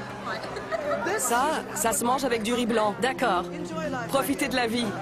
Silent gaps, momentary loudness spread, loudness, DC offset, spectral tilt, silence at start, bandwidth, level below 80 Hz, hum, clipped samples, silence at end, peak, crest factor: none; 8 LU; -26 LUFS; under 0.1%; -3.5 dB/octave; 0 s; 15.5 kHz; -54 dBFS; none; under 0.1%; 0 s; -10 dBFS; 16 dB